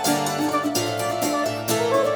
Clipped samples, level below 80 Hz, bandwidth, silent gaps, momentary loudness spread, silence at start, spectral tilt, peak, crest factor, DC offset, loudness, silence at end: under 0.1%; -62 dBFS; over 20 kHz; none; 3 LU; 0 s; -3.5 dB/octave; -8 dBFS; 14 dB; under 0.1%; -23 LUFS; 0 s